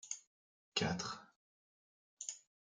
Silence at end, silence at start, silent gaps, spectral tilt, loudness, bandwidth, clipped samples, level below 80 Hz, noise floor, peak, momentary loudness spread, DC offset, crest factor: 0.3 s; 0.05 s; 0.27-0.72 s, 1.36-2.17 s; -3 dB/octave; -42 LUFS; 10 kHz; under 0.1%; -76 dBFS; under -90 dBFS; -20 dBFS; 10 LU; under 0.1%; 26 dB